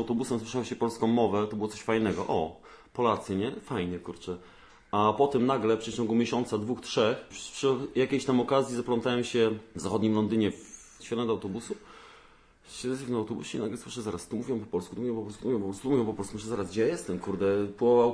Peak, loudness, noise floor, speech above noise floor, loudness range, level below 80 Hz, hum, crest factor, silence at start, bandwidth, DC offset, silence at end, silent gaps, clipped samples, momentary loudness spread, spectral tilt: -12 dBFS; -30 LUFS; -57 dBFS; 28 dB; 7 LU; -60 dBFS; none; 18 dB; 0 s; 11 kHz; under 0.1%; 0 s; none; under 0.1%; 11 LU; -5.5 dB/octave